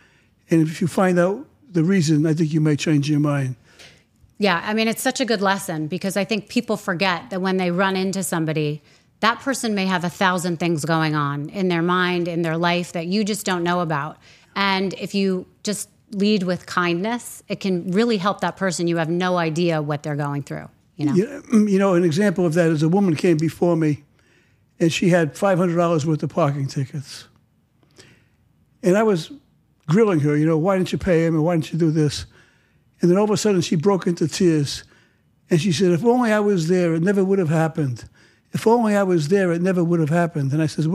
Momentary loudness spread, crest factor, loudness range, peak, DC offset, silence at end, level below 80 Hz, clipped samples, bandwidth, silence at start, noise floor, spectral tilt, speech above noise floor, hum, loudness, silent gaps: 9 LU; 20 dB; 3 LU; -2 dBFS; under 0.1%; 0 s; -56 dBFS; under 0.1%; 15 kHz; 0.5 s; -60 dBFS; -6 dB/octave; 41 dB; none; -20 LUFS; none